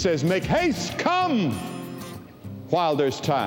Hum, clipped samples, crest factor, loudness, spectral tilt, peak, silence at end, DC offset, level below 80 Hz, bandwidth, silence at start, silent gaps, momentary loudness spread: none; under 0.1%; 16 dB; -24 LUFS; -5.5 dB/octave; -8 dBFS; 0 s; under 0.1%; -50 dBFS; 19 kHz; 0 s; none; 17 LU